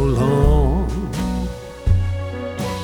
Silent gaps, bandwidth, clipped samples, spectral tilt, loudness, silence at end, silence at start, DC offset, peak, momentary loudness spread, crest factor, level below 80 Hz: none; 17 kHz; under 0.1%; -7.5 dB/octave; -20 LUFS; 0 s; 0 s; under 0.1%; -2 dBFS; 10 LU; 16 dB; -22 dBFS